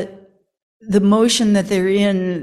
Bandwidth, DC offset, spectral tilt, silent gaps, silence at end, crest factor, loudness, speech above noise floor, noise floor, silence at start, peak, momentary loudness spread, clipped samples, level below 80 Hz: 13 kHz; under 0.1%; -5 dB/octave; 0.62-0.80 s; 0 s; 14 dB; -16 LUFS; 32 dB; -47 dBFS; 0 s; -2 dBFS; 5 LU; under 0.1%; -54 dBFS